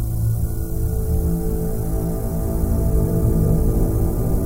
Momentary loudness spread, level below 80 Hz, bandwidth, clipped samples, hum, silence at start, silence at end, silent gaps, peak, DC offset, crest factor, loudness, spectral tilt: 5 LU; -22 dBFS; 16.5 kHz; under 0.1%; none; 0 s; 0 s; none; -6 dBFS; under 0.1%; 12 dB; -22 LUFS; -8.5 dB/octave